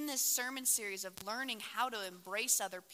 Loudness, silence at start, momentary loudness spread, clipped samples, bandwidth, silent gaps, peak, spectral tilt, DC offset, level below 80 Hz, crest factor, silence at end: -35 LUFS; 0 s; 9 LU; under 0.1%; 16.5 kHz; none; -18 dBFS; 0.5 dB/octave; under 0.1%; -84 dBFS; 20 dB; 0 s